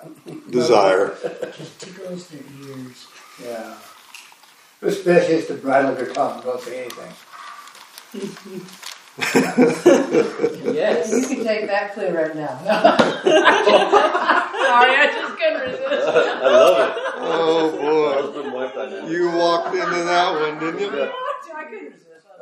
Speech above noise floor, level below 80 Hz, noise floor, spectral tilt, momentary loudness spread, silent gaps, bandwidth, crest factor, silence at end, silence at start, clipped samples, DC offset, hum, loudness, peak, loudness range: 31 dB; -70 dBFS; -50 dBFS; -4 dB/octave; 22 LU; none; 15.5 kHz; 20 dB; 0.5 s; 0 s; under 0.1%; under 0.1%; none; -18 LUFS; 0 dBFS; 11 LU